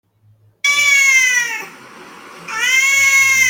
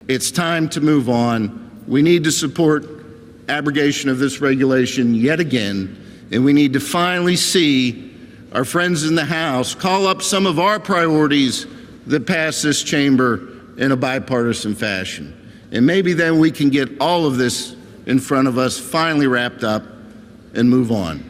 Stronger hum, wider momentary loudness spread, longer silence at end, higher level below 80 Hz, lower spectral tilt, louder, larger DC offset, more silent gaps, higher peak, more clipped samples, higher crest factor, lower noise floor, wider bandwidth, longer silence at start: neither; first, 16 LU vs 10 LU; about the same, 0 s vs 0 s; second, -68 dBFS vs -52 dBFS; second, 2.5 dB/octave vs -4.5 dB/octave; first, -11 LUFS vs -17 LUFS; neither; neither; about the same, -2 dBFS vs -4 dBFS; neither; about the same, 14 dB vs 14 dB; first, -53 dBFS vs -40 dBFS; about the same, 17 kHz vs 16 kHz; first, 0.65 s vs 0.05 s